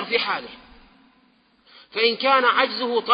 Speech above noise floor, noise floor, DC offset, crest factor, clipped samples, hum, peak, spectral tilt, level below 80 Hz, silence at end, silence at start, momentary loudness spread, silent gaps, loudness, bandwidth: 39 dB; -60 dBFS; under 0.1%; 18 dB; under 0.1%; none; -4 dBFS; -7 dB/octave; -64 dBFS; 0 s; 0 s; 13 LU; none; -20 LUFS; 5.2 kHz